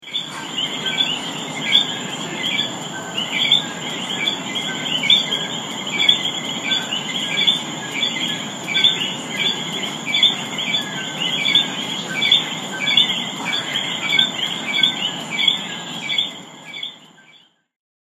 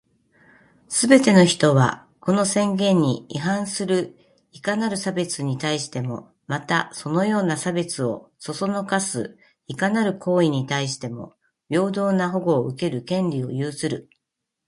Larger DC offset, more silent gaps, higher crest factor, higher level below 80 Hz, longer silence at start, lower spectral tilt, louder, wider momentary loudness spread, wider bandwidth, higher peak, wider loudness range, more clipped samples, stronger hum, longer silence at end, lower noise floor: neither; neither; about the same, 22 dB vs 22 dB; about the same, -66 dBFS vs -64 dBFS; second, 0 s vs 0.9 s; second, -1.5 dB/octave vs -5 dB/octave; first, -18 LUFS vs -22 LUFS; second, 10 LU vs 13 LU; first, 15.5 kHz vs 11.5 kHz; about the same, 0 dBFS vs 0 dBFS; second, 3 LU vs 6 LU; neither; neither; first, 1 s vs 0.65 s; second, -52 dBFS vs -82 dBFS